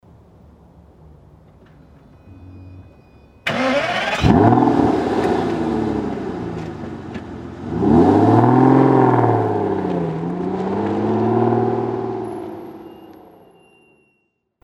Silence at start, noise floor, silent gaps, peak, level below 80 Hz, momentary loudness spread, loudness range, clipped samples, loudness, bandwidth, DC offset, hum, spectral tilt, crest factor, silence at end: 2.25 s; -68 dBFS; none; 0 dBFS; -42 dBFS; 18 LU; 9 LU; under 0.1%; -17 LUFS; 11.5 kHz; under 0.1%; none; -8 dB/octave; 18 dB; 1.5 s